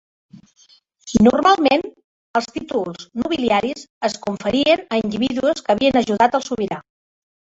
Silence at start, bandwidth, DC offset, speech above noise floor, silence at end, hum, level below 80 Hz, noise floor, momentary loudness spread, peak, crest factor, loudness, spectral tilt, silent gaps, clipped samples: 0.35 s; 8 kHz; under 0.1%; 36 dB; 0.75 s; none; -50 dBFS; -54 dBFS; 10 LU; -2 dBFS; 18 dB; -19 LUFS; -5 dB/octave; 2.04-2.34 s, 3.90-4.01 s; under 0.1%